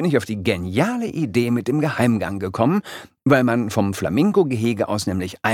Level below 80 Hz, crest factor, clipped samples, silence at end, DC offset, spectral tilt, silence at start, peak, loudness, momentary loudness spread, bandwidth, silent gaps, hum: -52 dBFS; 18 dB; under 0.1%; 0 s; under 0.1%; -6.5 dB/octave; 0 s; -2 dBFS; -20 LUFS; 7 LU; 16.5 kHz; none; none